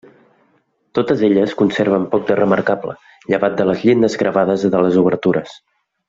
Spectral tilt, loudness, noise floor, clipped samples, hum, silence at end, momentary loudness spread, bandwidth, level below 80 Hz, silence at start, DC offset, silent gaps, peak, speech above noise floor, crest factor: -7 dB/octave; -16 LUFS; -61 dBFS; under 0.1%; none; 0.55 s; 8 LU; 7.8 kHz; -56 dBFS; 0.95 s; under 0.1%; none; -2 dBFS; 46 dB; 14 dB